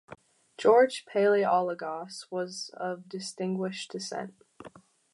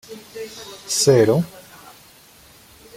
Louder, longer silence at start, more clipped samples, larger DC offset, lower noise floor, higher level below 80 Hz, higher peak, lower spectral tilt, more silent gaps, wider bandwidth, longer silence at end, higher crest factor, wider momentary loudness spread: second, -29 LUFS vs -17 LUFS; about the same, 0.1 s vs 0.1 s; neither; neither; first, -53 dBFS vs -48 dBFS; second, -78 dBFS vs -58 dBFS; second, -8 dBFS vs -4 dBFS; about the same, -4.5 dB/octave vs -4.5 dB/octave; neither; second, 11.5 kHz vs 16.5 kHz; second, 0.45 s vs 1.35 s; about the same, 20 dB vs 18 dB; second, 15 LU vs 22 LU